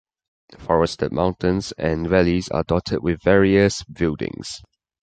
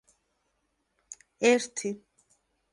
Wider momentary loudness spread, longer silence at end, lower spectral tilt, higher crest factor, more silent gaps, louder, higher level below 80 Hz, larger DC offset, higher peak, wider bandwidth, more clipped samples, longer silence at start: second, 12 LU vs 24 LU; second, 0.45 s vs 0.75 s; first, -6 dB/octave vs -3 dB/octave; about the same, 18 dB vs 22 dB; neither; first, -20 LUFS vs -27 LUFS; first, -38 dBFS vs -78 dBFS; neither; first, -2 dBFS vs -10 dBFS; second, 9.2 kHz vs 11.5 kHz; neither; second, 0.5 s vs 1.1 s